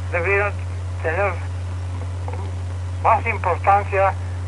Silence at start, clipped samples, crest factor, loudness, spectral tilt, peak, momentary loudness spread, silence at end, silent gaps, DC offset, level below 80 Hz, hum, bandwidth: 0 s; under 0.1%; 18 dB; -21 LUFS; -7 dB/octave; -2 dBFS; 11 LU; 0 s; none; under 0.1%; -40 dBFS; none; 10.5 kHz